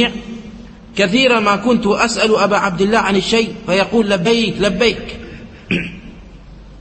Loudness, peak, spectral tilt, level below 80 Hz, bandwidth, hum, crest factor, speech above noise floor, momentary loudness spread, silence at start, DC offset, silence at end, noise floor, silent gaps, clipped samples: -14 LUFS; 0 dBFS; -4.5 dB/octave; -40 dBFS; 8.8 kHz; none; 16 dB; 22 dB; 19 LU; 0 s; under 0.1%; 0 s; -37 dBFS; none; under 0.1%